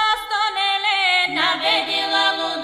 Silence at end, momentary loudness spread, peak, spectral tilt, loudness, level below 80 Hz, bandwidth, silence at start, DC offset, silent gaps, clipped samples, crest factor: 0 s; 3 LU; -4 dBFS; -1 dB/octave; -18 LUFS; -58 dBFS; 15.5 kHz; 0 s; under 0.1%; none; under 0.1%; 14 dB